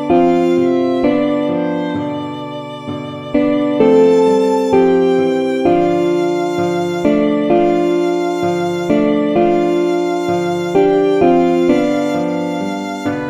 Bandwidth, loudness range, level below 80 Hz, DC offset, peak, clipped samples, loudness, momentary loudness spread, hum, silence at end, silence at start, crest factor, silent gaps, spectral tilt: 11 kHz; 3 LU; -48 dBFS; under 0.1%; 0 dBFS; under 0.1%; -14 LUFS; 9 LU; none; 0 s; 0 s; 14 dB; none; -7 dB/octave